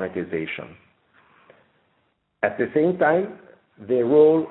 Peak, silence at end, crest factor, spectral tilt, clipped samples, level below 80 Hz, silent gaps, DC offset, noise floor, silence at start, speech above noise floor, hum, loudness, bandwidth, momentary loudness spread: -6 dBFS; 0 s; 18 dB; -11.5 dB/octave; under 0.1%; -66 dBFS; none; under 0.1%; -69 dBFS; 0 s; 48 dB; none; -21 LUFS; 4.1 kHz; 17 LU